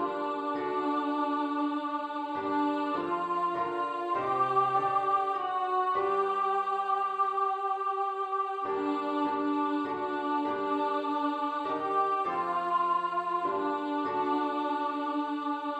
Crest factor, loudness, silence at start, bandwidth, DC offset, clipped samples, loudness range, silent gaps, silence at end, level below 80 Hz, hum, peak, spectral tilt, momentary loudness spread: 14 dB; -30 LUFS; 0 s; 8.6 kHz; under 0.1%; under 0.1%; 2 LU; none; 0 s; -76 dBFS; none; -16 dBFS; -6 dB/octave; 4 LU